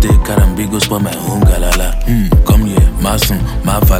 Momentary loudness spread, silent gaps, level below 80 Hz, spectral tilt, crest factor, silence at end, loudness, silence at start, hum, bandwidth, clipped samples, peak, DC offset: 5 LU; none; -12 dBFS; -5.5 dB/octave; 10 dB; 0 s; -13 LUFS; 0 s; none; 17 kHz; under 0.1%; 0 dBFS; under 0.1%